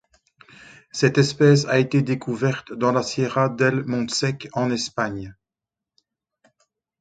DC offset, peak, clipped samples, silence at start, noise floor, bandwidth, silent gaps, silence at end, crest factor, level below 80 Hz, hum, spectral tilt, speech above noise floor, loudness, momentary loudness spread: under 0.1%; -2 dBFS; under 0.1%; 0.95 s; -88 dBFS; 9.2 kHz; none; 1.7 s; 20 dB; -58 dBFS; none; -5.5 dB/octave; 67 dB; -21 LUFS; 9 LU